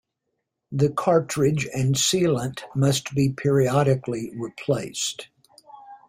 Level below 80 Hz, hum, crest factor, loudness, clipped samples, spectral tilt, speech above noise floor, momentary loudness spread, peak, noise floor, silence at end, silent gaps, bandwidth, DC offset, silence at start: -56 dBFS; none; 16 dB; -23 LUFS; under 0.1%; -5 dB/octave; 56 dB; 10 LU; -6 dBFS; -79 dBFS; 0.1 s; none; 16 kHz; under 0.1%; 0.7 s